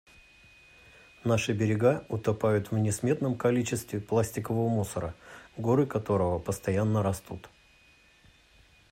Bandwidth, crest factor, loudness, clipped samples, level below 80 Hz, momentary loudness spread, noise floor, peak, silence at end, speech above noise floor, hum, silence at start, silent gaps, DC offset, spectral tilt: 16 kHz; 18 dB; -29 LUFS; under 0.1%; -58 dBFS; 10 LU; -60 dBFS; -12 dBFS; 1.45 s; 32 dB; none; 1.25 s; none; under 0.1%; -6.5 dB/octave